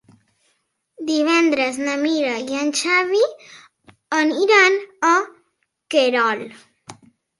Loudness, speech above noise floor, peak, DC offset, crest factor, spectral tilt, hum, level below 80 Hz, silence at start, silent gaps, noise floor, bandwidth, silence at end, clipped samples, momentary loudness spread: -18 LUFS; 50 dB; -2 dBFS; under 0.1%; 18 dB; -2 dB/octave; none; -72 dBFS; 1 s; none; -69 dBFS; 11.5 kHz; 0.45 s; under 0.1%; 9 LU